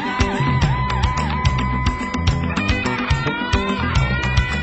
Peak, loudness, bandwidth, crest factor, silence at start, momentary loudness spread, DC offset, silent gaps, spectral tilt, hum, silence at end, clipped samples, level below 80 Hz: -2 dBFS; -20 LUFS; 8.4 kHz; 16 dB; 0 s; 2 LU; under 0.1%; none; -5.5 dB/octave; none; 0 s; under 0.1%; -26 dBFS